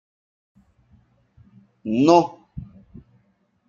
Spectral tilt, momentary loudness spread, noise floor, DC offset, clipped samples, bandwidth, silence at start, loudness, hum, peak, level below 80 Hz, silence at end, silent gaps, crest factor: -6.5 dB/octave; 24 LU; -65 dBFS; under 0.1%; under 0.1%; 7.4 kHz; 1.85 s; -18 LUFS; none; -2 dBFS; -56 dBFS; 1.05 s; none; 24 dB